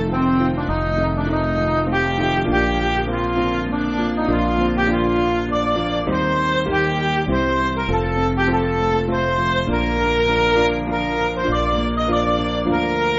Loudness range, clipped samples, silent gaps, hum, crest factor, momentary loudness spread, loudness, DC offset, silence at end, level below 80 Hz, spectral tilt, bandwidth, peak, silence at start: 1 LU; under 0.1%; none; none; 14 dB; 3 LU; -19 LUFS; 0.1%; 0 s; -30 dBFS; -4.5 dB/octave; 8 kHz; -6 dBFS; 0 s